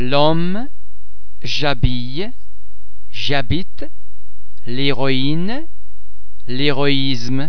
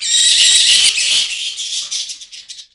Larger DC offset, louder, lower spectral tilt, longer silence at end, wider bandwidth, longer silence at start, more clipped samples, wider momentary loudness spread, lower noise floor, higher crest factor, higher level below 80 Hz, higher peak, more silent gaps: first, 30% vs under 0.1%; second, -20 LUFS vs -11 LUFS; first, -6 dB/octave vs 4.5 dB/octave; about the same, 0 s vs 0.1 s; second, 5.4 kHz vs over 20 kHz; about the same, 0 s vs 0 s; neither; second, 18 LU vs 21 LU; first, -47 dBFS vs -35 dBFS; first, 22 dB vs 14 dB; first, -32 dBFS vs -56 dBFS; about the same, 0 dBFS vs 0 dBFS; neither